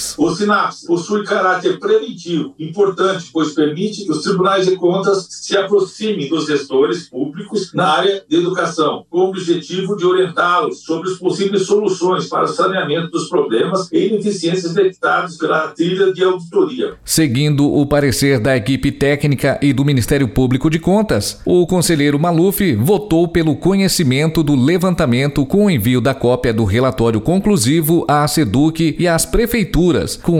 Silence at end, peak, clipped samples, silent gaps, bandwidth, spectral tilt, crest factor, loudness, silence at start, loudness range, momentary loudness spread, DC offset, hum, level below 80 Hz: 0 s; -2 dBFS; under 0.1%; none; 17 kHz; -5.5 dB/octave; 12 dB; -15 LUFS; 0 s; 3 LU; 5 LU; under 0.1%; none; -36 dBFS